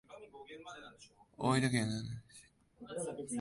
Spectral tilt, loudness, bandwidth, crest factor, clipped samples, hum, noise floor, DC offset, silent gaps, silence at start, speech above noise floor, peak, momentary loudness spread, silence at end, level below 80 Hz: -5 dB/octave; -37 LUFS; 11.5 kHz; 20 dB; under 0.1%; none; -62 dBFS; under 0.1%; none; 0.1 s; 25 dB; -18 dBFS; 25 LU; 0 s; -68 dBFS